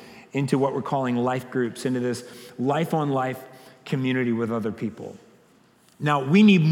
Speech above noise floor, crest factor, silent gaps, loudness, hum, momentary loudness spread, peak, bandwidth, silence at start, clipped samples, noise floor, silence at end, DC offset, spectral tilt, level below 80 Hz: 35 dB; 18 dB; none; -24 LUFS; none; 14 LU; -6 dBFS; 15.5 kHz; 0 s; under 0.1%; -58 dBFS; 0 s; under 0.1%; -7 dB/octave; -74 dBFS